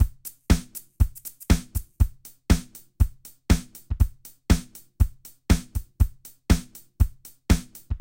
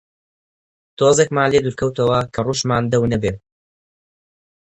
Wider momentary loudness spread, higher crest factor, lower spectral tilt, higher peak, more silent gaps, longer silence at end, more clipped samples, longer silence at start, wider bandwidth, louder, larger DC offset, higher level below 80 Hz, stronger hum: first, 17 LU vs 7 LU; about the same, 20 dB vs 20 dB; about the same, -5.5 dB/octave vs -5 dB/octave; second, -4 dBFS vs 0 dBFS; neither; second, 0.05 s vs 1.4 s; neither; second, 0 s vs 1 s; first, 17 kHz vs 8.8 kHz; second, -26 LUFS vs -18 LUFS; neither; first, -26 dBFS vs -44 dBFS; neither